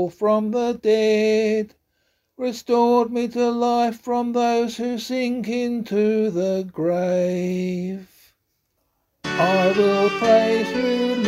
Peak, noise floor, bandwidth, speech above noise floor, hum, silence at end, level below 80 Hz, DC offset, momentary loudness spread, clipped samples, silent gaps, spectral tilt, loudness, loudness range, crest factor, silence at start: -4 dBFS; -71 dBFS; 15.5 kHz; 51 dB; none; 0 s; -62 dBFS; under 0.1%; 9 LU; under 0.1%; none; -6 dB/octave; -21 LUFS; 3 LU; 16 dB; 0 s